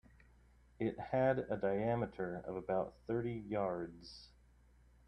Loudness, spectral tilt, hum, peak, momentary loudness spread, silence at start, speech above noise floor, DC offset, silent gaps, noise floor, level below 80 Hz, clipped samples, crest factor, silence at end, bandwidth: -39 LUFS; -8.5 dB/octave; none; -22 dBFS; 11 LU; 0.8 s; 28 dB; under 0.1%; none; -66 dBFS; -64 dBFS; under 0.1%; 18 dB; 0.8 s; 9.8 kHz